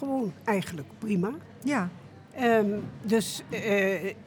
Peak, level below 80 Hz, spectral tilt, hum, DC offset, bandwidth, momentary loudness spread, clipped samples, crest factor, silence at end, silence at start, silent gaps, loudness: -12 dBFS; -68 dBFS; -5.5 dB/octave; none; under 0.1%; over 20 kHz; 12 LU; under 0.1%; 16 dB; 0 s; 0 s; none; -29 LUFS